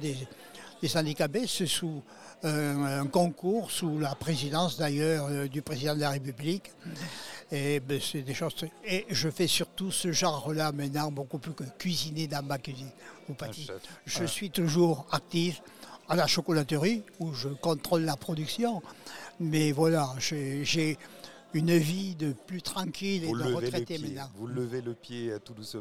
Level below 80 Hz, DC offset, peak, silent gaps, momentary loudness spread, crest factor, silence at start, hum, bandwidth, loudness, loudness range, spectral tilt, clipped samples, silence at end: -64 dBFS; 0.2%; -12 dBFS; none; 14 LU; 20 dB; 0 s; none; 16.5 kHz; -31 LUFS; 4 LU; -4.5 dB/octave; under 0.1%; 0 s